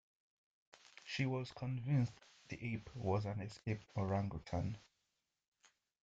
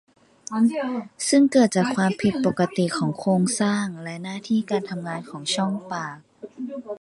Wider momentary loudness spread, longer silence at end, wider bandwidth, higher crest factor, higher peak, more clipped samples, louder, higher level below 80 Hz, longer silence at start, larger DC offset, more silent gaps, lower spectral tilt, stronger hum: about the same, 14 LU vs 15 LU; first, 1.25 s vs 0.05 s; second, 8 kHz vs 11.5 kHz; about the same, 20 dB vs 18 dB; second, -22 dBFS vs -6 dBFS; neither; second, -42 LUFS vs -23 LUFS; about the same, -66 dBFS vs -62 dBFS; first, 1.05 s vs 0.5 s; neither; neither; first, -7 dB/octave vs -5 dB/octave; neither